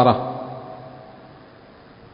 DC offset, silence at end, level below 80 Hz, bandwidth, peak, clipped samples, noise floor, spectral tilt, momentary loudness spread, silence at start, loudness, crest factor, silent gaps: under 0.1%; 0.75 s; -54 dBFS; 5.4 kHz; -2 dBFS; under 0.1%; -46 dBFS; -11.5 dB/octave; 23 LU; 0 s; -25 LUFS; 24 dB; none